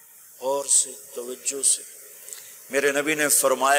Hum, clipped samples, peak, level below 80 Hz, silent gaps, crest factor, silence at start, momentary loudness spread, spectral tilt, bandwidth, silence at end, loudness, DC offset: none; under 0.1%; -8 dBFS; -84 dBFS; none; 18 dB; 0.4 s; 20 LU; -0.5 dB/octave; 16 kHz; 0 s; -22 LUFS; under 0.1%